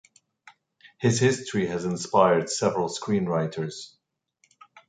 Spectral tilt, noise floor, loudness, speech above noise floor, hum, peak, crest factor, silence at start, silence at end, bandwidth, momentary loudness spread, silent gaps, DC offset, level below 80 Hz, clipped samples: -5 dB/octave; -69 dBFS; -25 LUFS; 44 dB; none; -6 dBFS; 22 dB; 0.85 s; 1 s; 9.4 kHz; 12 LU; none; under 0.1%; -62 dBFS; under 0.1%